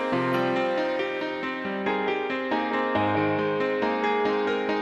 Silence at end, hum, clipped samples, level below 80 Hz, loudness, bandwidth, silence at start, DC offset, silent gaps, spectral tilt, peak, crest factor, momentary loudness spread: 0 s; none; under 0.1%; -64 dBFS; -26 LUFS; 12 kHz; 0 s; under 0.1%; none; -6.5 dB/octave; -12 dBFS; 14 dB; 4 LU